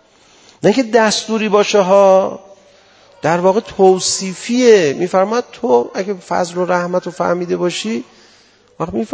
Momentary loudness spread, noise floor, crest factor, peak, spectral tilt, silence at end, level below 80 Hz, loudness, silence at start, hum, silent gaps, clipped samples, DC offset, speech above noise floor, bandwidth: 11 LU; -49 dBFS; 14 dB; 0 dBFS; -4.5 dB/octave; 0 s; -54 dBFS; -14 LUFS; 0.65 s; none; none; 0.1%; under 0.1%; 35 dB; 8 kHz